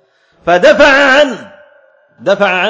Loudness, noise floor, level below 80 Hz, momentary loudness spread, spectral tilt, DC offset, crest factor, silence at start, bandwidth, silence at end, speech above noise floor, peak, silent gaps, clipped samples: -8 LUFS; -47 dBFS; -44 dBFS; 15 LU; -3.5 dB/octave; under 0.1%; 10 dB; 0.45 s; 8 kHz; 0 s; 39 dB; 0 dBFS; none; 0.8%